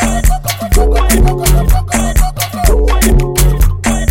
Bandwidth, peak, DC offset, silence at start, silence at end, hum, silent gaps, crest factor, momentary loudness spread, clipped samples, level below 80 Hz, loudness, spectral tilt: 17 kHz; 0 dBFS; under 0.1%; 0 s; 0 s; none; none; 10 dB; 4 LU; under 0.1%; -12 dBFS; -12 LUFS; -5 dB/octave